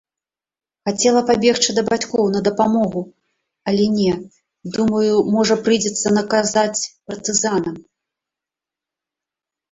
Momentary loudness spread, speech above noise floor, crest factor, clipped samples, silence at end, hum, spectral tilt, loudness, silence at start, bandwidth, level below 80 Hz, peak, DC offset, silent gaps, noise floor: 12 LU; over 73 dB; 18 dB; under 0.1%; 1.9 s; none; -4 dB/octave; -18 LUFS; 0.85 s; 8.2 kHz; -56 dBFS; -2 dBFS; under 0.1%; none; under -90 dBFS